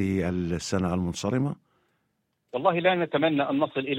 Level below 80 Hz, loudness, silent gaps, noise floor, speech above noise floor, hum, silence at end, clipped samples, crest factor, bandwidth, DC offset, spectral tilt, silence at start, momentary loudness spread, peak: -54 dBFS; -26 LUFS; none; -75 dBFS; 50 dB; none; 0 s; under 0.1%; 18 dB; 13 kHz; under 0.1%; -6 dB/octave; 0 s; 6 LU; -8 dBFS